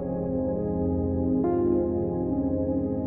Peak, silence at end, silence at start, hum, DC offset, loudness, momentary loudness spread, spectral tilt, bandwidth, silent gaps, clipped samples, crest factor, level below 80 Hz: -14 dBFS; 0 s; 0 s; none; under 0.1%; -26 LUFS; 4 LU; -15 dB/octave; 2.2 kHz; none; under 0.1%; 12 dB; -42 dBFS